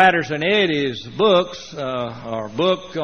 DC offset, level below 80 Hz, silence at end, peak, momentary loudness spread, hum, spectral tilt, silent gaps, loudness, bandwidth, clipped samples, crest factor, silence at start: 0.2%; -56 dBFS; 0 s; 0 dBFS; 11 LU; none; -2.5 dB/octave; none; -20 LUFS; 6.6 kHz; under 0.1%; 20 dB; 0 s